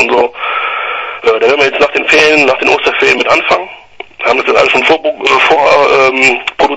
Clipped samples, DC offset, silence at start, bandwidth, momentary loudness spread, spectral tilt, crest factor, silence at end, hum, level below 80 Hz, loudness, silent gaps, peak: 0.5%; under 0.1%; 0 s; 11 kHz; 8 LU; -2.5 dB/octave; 10 dB; 0 s; none; -44 dBFS; -8 LUFS; none; 0 dBFS